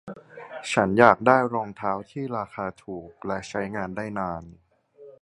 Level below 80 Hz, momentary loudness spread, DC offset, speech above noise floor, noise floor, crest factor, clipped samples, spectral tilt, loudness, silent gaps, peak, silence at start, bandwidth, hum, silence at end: -58 dBFS; 21 LU; under 0.1%; 26 dB; -50 dBFS; 26 dB; under 0.1%; -6 dB/octave; -24 LUFS; none; 0 dBFS; 0.05 s; 11.5 kHz; none; 0.1 s